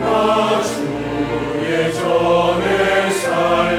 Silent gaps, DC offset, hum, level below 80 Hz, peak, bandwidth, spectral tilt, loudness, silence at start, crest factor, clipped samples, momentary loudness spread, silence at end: none; under 0.1%; none; -42 dBFS; -4 dBFS; 17 kHz; -4.5 dB/octave; -17 LUFS; 0 s; 14 dB; under 0.1%; 6 LU; 0 s